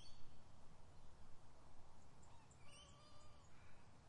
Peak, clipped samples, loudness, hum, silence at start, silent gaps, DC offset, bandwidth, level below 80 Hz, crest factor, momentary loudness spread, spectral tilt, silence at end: -40 dBFS; under 0.1%; -67 LUFS; none; 0 s; none; under 0.1%; 11 kHz; -68 dBFS; 14 dB; 5 LU; -4 dB/octave; 0 s